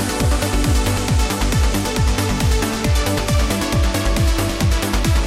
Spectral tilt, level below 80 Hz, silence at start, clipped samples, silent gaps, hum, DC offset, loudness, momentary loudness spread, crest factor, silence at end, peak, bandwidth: -4.5 dB/octave; -20 dBFS; 0 s; under 0.1%; none; none; under 0.1%; -18 LUFS; 1 LU; 12 dB; 0 s; -4 dBFS; 16 kHz